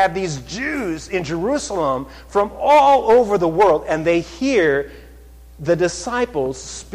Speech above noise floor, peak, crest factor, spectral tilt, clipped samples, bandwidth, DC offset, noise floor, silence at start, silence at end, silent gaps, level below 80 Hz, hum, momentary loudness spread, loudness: 24 dB; -6 dBFS; 12 dB; -5 dB/octave; under 0.1%; 14 kHz; under 0.1%; -42 dBFS; 0 s; 0 s; none; -42 dBFS; none; 12 LU; -18 LUFS